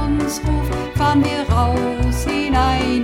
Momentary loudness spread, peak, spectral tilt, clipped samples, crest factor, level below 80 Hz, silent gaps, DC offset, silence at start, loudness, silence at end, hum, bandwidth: 4 LU; -4 dBFS; -6 dB/octave; under 0.1%; 14 dB; -24 dBFS; none; under 0.1%; 0 s; -18 LUFS; 0 s; none; 16.5 kHz